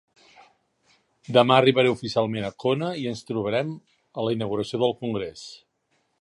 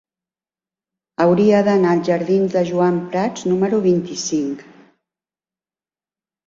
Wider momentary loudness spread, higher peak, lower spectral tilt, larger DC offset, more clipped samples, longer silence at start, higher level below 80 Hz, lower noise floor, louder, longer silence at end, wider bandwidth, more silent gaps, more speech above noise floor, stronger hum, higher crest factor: first, 17 LU vs 8 LU; about the same, -2 dBFS vs -4 dBFS; about the same, -6 dB/octave vs -6 dB/octave; neither; neither; about the same, 1.3 s vs 1.2 s; about the same, -62 dBFS vs -60 dBFS; second, -71 dBFS vs under -90 dBFS; second, -24 LUFS vs -17 LUFS; second, 0.65 s vs 1.85 s; first, 11.5 kHz vs 7.8 kHz; neither; second, 48 dB vs over 73 dB; neither; first, 22 dB vs 16 dB